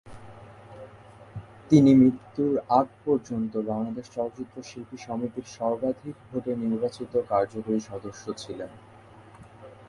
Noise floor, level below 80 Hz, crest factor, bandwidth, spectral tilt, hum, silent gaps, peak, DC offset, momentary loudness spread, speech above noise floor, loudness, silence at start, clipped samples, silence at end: -50 dBFS; -60 dBFS; 22 dB; 11 kHz; -7.5 dB/octave; none; none; -6 dBFS; under 0.1%; 24 LU; 24 dB; -26 LUFS; 0.05 s; under 0.1%; 0.15 s